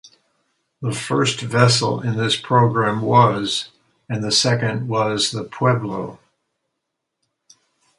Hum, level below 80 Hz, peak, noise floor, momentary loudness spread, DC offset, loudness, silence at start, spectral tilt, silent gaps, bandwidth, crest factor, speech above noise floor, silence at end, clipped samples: none; -56 dBFS; 0 dBFS; -78 dBFS; 12 LU; under 0.1%; -19 LUFS; 0.8 s; -4.5 dB/octave; none; 11.5 kHz; 20 dB; 60 dB; 1.85 s; under 0.1%